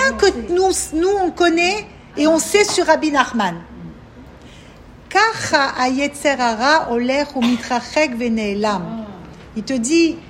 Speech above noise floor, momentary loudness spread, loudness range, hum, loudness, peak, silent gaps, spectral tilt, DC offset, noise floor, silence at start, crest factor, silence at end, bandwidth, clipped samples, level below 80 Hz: 24 dB; 15 LU; 3 LU; none; -17 LUFS; 0 dBFS; none; -3 dB/octave; under 0.1%; -41 dBFS; 0 s; 18 dB; 0 s; 16 kHz; under 0.1%; -44 dBFS